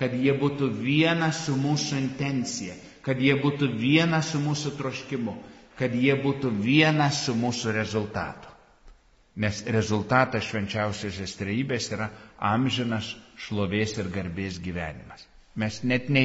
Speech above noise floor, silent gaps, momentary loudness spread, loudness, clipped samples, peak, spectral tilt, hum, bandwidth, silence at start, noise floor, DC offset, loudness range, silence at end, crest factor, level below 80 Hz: 28 dB; none; 12 LU; -26 LUFS; under 0.1%; -4 dBFS; -4.5 dB/octave; none; 8 kHz; 0 s; -54 dBFS; under 0.1%; 4 LU; 0 s; 22 dB; -56 dBFS